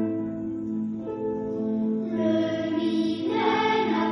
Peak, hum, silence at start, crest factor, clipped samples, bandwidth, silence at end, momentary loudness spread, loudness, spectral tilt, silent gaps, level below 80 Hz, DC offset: -10 dBFS; none; 0 s; 16 dB; under 0.1%; 6.2 kHz; 0 s; 8 LU; -26 LUFS; -7 dB/octave; none; -62 dBFS; under 0.1%